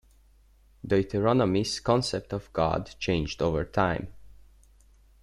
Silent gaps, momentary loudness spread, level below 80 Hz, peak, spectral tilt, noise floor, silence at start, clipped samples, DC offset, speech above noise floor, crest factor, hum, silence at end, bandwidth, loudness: none; 9 LU; -48 dBFS; -10 dBFS; -6 dB/octave; -59 dBFS; 0.85 s; under 0.1%; under 0.1%; 32 dB; 18 dB; none; 0.95 s; 12.5 kHz; -27 LUFS